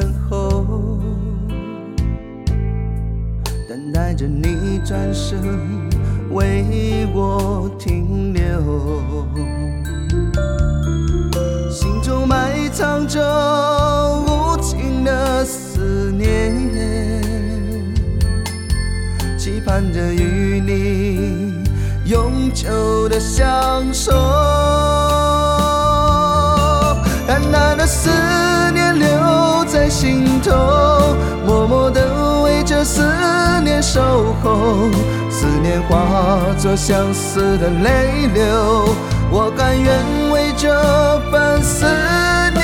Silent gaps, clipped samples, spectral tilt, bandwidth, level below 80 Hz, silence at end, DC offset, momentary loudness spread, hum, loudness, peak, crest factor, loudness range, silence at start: none; under 0.1%; -5.5 dB/octave; 17.5 kHz; -22 dBFS; 0 s; under 0.1%; 8 LU; none; -16 LUFS; 0 dBFS; 14 dB; 6 LU; 0 s